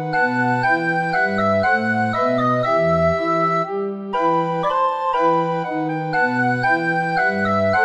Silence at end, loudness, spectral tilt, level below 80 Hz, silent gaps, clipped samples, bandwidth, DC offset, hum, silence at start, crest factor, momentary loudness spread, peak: 0 s; -19 LUFS; -7 dB/octave; -50 dBFS; none; under 0.1%; 11 kHz; under 0.1%; none; 0 s; 14 dB; 4 LU; -4 dBFS